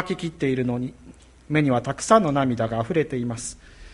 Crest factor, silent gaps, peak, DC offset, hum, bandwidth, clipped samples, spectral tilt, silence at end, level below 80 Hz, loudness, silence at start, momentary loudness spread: 20 dB; none; -4 dBFS; under 0.1%; none; 11.5 kHz; under 0.1%; -6 dB/octave; 0 s; -50 dBFS; -23 LUFS; 0 s; 12 LU